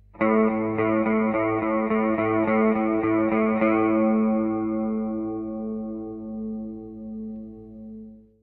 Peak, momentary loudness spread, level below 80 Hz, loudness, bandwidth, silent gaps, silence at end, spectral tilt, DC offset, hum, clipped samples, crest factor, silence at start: -8 dBFS; 16 LU; -54 dBFS; -24 LUFS; 3.6 kHz; none; 0.25 s; -11.5 dB/octave; under 0.1%; none; under 0.1%; 16 dB; 0.15 s